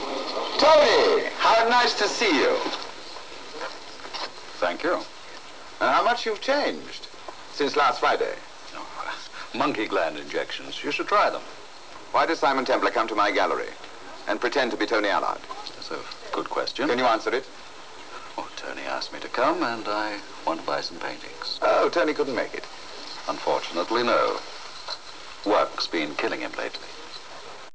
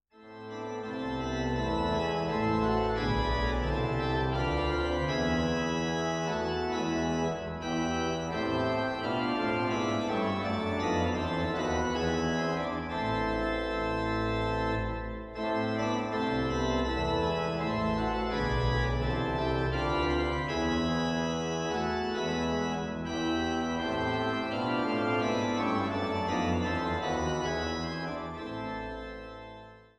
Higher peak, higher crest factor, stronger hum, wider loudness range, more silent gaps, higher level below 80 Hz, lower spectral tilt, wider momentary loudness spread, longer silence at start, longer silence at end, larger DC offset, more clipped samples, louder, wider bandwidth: first, -8 dBFS vs -16 dBFS; about the same, 18 dB vs 14 dB; neither; first, 5 LU vs 2 LU; neither; second, -64 dBFS vs -42 dBFS; second, -2.5 dB/octave vs -6 dB/octave; first, 18 LU vs 6 LU; second, 0 s vs 0.15 s; second, 0.05 s vs 0.2 s; first, 0.9% vs under 0.1%; neither; first, -24 LUFS vs -31 LUFS; second, 8 kHz vs 10.5 kHz